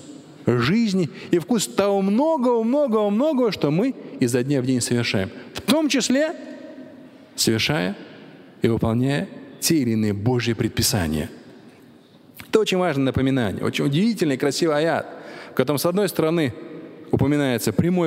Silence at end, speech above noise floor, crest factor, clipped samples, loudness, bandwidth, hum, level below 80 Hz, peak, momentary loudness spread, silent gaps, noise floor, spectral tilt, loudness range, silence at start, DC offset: 0 s; 29 dB; 20 dB; under 0.1%; -21 LUFS; 16 kHz; none; -50 dBFS; -2 dBFS; 11 LU; none; -49 dBFS; -5 dB/octave; 3 LU; 0 s; under 0.1%